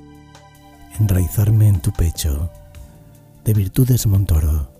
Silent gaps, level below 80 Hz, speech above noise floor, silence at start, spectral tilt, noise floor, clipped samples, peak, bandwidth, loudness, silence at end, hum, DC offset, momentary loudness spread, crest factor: none; -26 dBFS; 29 dB; 0.9 s; -6.5 dB/octave; -44 dBFS; under 0.1%; -2 dBFS; 16 kHz; -18 LUFS; 0.15 s; none; under 0.1%; 11 LU; 16 dB